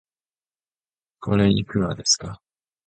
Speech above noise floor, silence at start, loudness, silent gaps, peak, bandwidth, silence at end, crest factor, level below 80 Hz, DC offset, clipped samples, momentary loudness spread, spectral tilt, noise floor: over 69 dB; 1.2 s; -21 LUFS; none; -4 dBFS; 9.2 kHz; 0.5 s; 20 dB; -48 dBFS; under 0.1%; under 0.1%; 13 LU; -4 dB/octave; under -90 dBFS